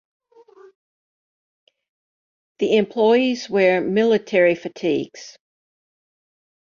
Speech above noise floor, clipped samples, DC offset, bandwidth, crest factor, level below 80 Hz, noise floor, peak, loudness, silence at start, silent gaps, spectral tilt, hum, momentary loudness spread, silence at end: 30 dB; under 0.1%; under 0.1%; 7.2 kHz; 18 dB; -68 dBFS; -49 dBFS; -4 dBFS; -19 LUFS; 2.6 s; none; -5.5 dB/octave; none; 9 LU; 1.4 s